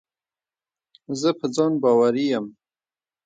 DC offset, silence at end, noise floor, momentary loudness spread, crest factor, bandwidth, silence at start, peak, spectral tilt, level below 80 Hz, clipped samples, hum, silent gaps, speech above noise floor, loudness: under 0.1%; 0.75 s; under -90 dBFS; 12 LU; 18 dB; 9.2 kHz; 1.1 s; -6 dBFS; -5.5 dB/octave; -72 dBFS; under 0.1%; none; none; over 69 dB; -21 LUFS